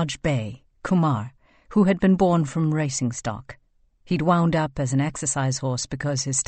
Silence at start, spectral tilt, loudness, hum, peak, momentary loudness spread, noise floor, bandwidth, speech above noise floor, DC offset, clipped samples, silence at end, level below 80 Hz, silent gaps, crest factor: 0 s; -5.5 dB/octave; -23 LUFS; none; -6 dBFS; 11 LU; -57 dBFS; 8.8 kHz; 34 dB; under 0.1%; under 0.1%; 0.05 s; -48 dBFS; none; 16 dB